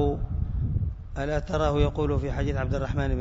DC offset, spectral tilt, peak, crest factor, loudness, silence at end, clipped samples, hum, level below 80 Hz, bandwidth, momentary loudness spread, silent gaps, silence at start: under 0.1%; -8 dB/octave; -8 dBFS; 18 dB; -28 LUFS; 0 s; under 0.1%; none; -32 dBFS; 7.8 kHz; 6 LU; none; 0 s